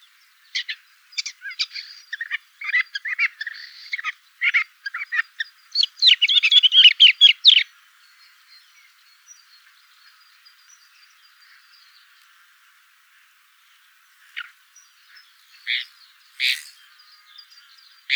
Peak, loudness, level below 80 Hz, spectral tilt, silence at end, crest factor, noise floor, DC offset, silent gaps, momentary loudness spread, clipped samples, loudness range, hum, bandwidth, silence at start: -2 dBFS; -16 LUFS; under -90 dBFS; 12 dB/octave; 0 s; 22 dB; -57 dBFS; under 0.1%; none; 25 LU; under 0.1%; 16 LU; none; over 20 kHz; 0.55 s